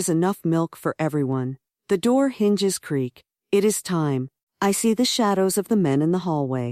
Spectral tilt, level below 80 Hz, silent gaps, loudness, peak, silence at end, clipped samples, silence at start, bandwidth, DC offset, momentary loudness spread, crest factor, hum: -5 dB/octave; -64 dBFS; 4.43-4.47 s; -22 LUFS; -8 dBFS; 0 s; under 0.1%; 0 s; 15.5 kHz; under 0.1%; 7 LU; 14 dB; none